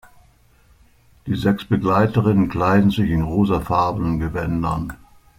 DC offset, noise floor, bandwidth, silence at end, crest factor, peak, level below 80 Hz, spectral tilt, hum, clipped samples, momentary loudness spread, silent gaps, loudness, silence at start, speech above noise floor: under 0.1%; -54 dBFS; 16 kHz; 0.45 s; 16 dB; -4 dBFS; -38 dBFS; -8 dB/octave; none; under 0.1%; 8 LU; none; -19 LUFS; 1.25 s; 36 dB